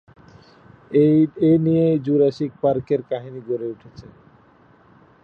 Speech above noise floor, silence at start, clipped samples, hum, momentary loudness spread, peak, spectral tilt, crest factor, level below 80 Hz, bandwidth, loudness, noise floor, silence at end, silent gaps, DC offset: 34 dB; 0.9 s; under 0.1%; none; 13 LU; -6 dBFS; -10 dB/octave; 14 dB; -58 dBFS; 6.2 kHz; -19 LUFS; -53 dBFS; 1.2 s; none; under 0.1%